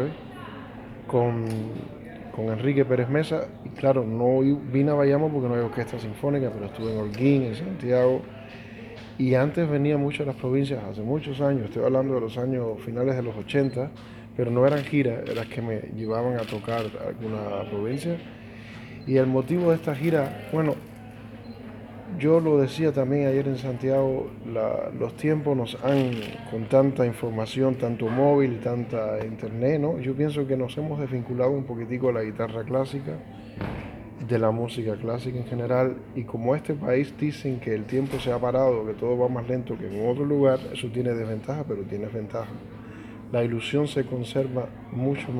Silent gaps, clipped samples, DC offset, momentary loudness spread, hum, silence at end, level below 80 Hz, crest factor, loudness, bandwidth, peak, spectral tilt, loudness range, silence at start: none; under 0.1%; under 0.1%; 15 LU; none; 0 s; -56 dBFS; 18 dB; -26 LUFS; 14.5 kHz; -8 dBFS; -8 dB/octave; 5 LU; 0 s